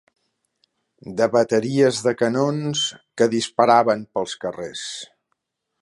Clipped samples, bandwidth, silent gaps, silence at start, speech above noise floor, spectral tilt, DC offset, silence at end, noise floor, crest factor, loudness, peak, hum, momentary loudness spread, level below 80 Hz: under 0.1%; 11.5 kHz; none; 1.05 s; 55 dB; -4.5 dB/octave; under 0.1%; 0.75 s; -75 dBFS; 20 dB; -20 LUFS; -2 dBFS; none; 14 LU; -66 dBFS